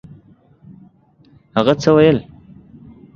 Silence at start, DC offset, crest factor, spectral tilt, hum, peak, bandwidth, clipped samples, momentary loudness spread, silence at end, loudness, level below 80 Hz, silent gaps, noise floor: 1.55 s; under 0.1%; 18 dB; -7 dB/octave; none; 0 dBFS; 7.4 kHz; under 0.1%; 10 LU; 0.95 s; -15 LUFS; -48 dBFS; none; -51 dBFS